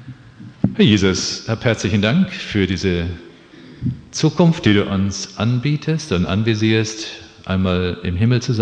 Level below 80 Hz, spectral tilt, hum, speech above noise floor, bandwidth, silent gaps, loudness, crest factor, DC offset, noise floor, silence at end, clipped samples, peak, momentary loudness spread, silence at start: -42 dBFS; -5.5 dB/octave; none; 24 dB; 9.2 kHz; none; -18 LUFS; 18 dB; under 0.1%; -41 dBFS; 0 s; under 0.1%; -2 dBFS; 10 LU; 0 s